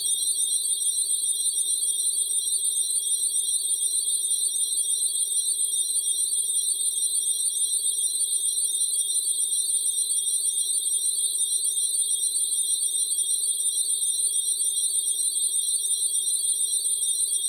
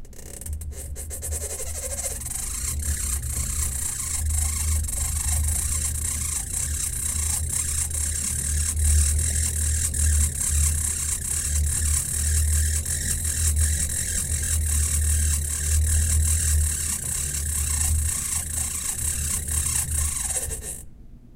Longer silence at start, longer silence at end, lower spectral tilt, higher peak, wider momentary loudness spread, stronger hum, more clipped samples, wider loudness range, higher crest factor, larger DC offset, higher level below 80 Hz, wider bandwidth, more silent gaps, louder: about the same, 0 s vs 0 s; about the same, 0 s vs 0 s; second, 4.5 dB/octave vs -2.5 dB/octave; second, -12 dBFS vs -8 dBFS; second, 1 LU vs 7 LU; neither; neither; second, 0 LU vs 3 LU; about the same, 12 dB vs 16 dB; neither; second, -86 dBFS vs -28 dBFS; first, 19.5 kHz vs 16.5 kHz; neither; about the same, -22 LUFS vs -23 LUFS